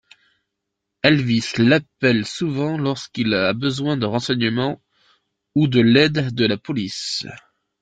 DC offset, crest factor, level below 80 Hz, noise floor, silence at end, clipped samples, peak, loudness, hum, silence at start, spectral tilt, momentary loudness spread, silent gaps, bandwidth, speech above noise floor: under 0.1%; 20 dB; -56 dBFS; -79 dBFS; 0.45 s; under 0.1%; 0 dBFS; -19 LUFS; none; 1.05 s; -5.5 dB/octave; 9 LU; none; 9.2 kHz; 61 dB